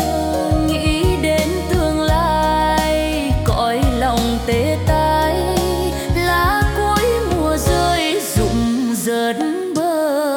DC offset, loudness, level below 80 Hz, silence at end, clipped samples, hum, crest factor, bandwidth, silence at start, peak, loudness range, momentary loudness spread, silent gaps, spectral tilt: under 0.1%; -17 LUFS; -26 dBFS; 0 s; under 0.1%; none; 14 dB; 18 kHz; 0 s; -4 dBFS; 1 LU; 3 LU; none; -5 dB/octave